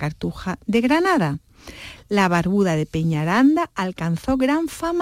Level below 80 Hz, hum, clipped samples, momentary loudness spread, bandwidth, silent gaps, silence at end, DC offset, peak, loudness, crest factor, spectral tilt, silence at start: -46 dBFS; none; under 0.1%; 11 LU; 16 kHz; none; 0 s; under 0.1%; -6 dBFS; -20 LUFS; 14 dB; -6.5 dB/octave; 0 s